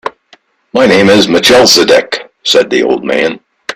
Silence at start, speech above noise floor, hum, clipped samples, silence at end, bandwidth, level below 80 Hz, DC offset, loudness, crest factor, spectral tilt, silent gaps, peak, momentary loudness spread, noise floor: 0.05 s; 39 dB; none; 0.4%; 0 s; 17.5 kHz; -46 dBFS; under 0.1%; -8 LUFS; 10 dB; -3 dB/octave; none; 0 dBFS; 12 LU; -46 dBFS